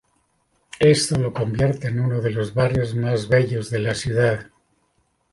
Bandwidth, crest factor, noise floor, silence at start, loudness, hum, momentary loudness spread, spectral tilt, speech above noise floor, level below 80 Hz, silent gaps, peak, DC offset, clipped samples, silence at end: 11.5 kHz; 18 dB; -67 dBFS; 0.8 s; -21 LUFS; none; 7 LU; -5.5 dB/octave; 47 dB; -46 dBFS; none; -4 dBFS; under 0.1%; under 0.1%; 0.9 s